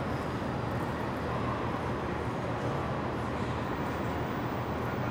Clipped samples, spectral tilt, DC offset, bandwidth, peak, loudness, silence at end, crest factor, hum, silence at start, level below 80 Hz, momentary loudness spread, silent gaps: under 0.1%; -7 dB/octave; under 0.1%; over 20 kHz; -20 dBFS; -33 LUFS; 0 s; 14 dB; none; 0 s; -46 dBFS; 1 LU; none